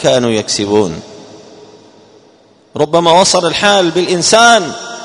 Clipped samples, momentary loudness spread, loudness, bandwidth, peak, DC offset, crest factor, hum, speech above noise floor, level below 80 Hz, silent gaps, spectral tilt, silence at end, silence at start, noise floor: 0.3%; 12 LU; -10 LUFS; 12 kHz; 0 dBFS; under 0.1%; 12 dB; none; 36 dB; -50 dBFS; none; -3 dB/octave; 0 s; 0 s; -46 dBFS